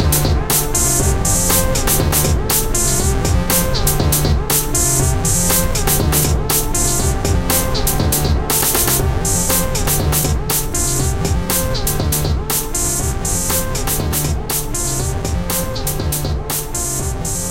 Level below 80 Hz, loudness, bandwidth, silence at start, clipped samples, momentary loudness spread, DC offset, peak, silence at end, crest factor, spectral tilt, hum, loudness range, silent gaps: -22 dBFS; -16 LUFS; 17 kHz; 0 s; under 0.1%; 6 LU; 0.3%; 0 dBFS; 0 s; 14 dB; -3.5 dB/octave; none; 4 LU; none